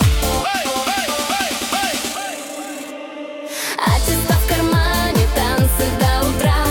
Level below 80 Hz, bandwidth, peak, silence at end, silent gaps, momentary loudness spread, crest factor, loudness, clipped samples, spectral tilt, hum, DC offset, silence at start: -24 dBFS; 18 kHz; -2 dBFS; 0 s; none; 12 LU; 16 dB; -18 LUFS; under 0.1%; -4 dB/octave; none; under 0.1%; 0 s